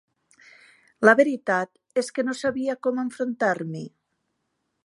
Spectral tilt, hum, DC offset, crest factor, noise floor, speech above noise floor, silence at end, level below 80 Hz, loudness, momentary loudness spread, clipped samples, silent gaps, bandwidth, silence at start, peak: -5.5 dB/octave; none; under 0.1%; 24 dB; -76 dBFS; 53 dB; 0.95 s; -72 dBFS; -24 LUFS; 12 LU; under 0.1%; none; 11.5 kHz; 1 s; -2 dBFS